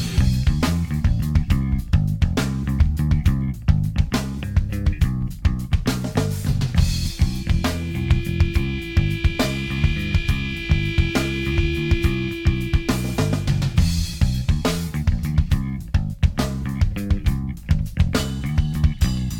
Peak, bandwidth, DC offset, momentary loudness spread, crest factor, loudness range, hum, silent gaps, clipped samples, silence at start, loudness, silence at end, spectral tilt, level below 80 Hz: -4 dBFS; 17 kHz; under 0.1%; 4 LU; 16 dB; 2 LU; none; none; under 0.1%; 0 s; -22 LUFS; 0 s; -6 dB/octave; -24 dBFS